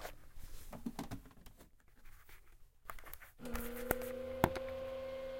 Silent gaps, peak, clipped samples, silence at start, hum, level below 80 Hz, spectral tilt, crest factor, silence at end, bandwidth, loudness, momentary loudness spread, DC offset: none; -8 dBFS; under 0.1%; 0 s; none; -54 dBFS; -5 dB/octave; 36 dB; 0 s; 16.5 kHz; -43 LUFS; 25 LU; under 0.1%